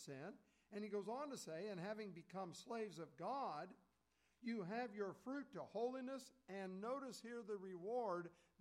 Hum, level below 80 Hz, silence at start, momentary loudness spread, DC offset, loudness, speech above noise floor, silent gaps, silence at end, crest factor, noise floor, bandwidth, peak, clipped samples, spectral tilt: none; under -90 dBFS; 0 s; 8 LU; under 0.1%; -50 LUFS; 34 dB; none; 0.25 s; 16 dB; -83 dBFS; 15.5 kHz; -34 dBFS; under 0.1%; -5.5 dB/octave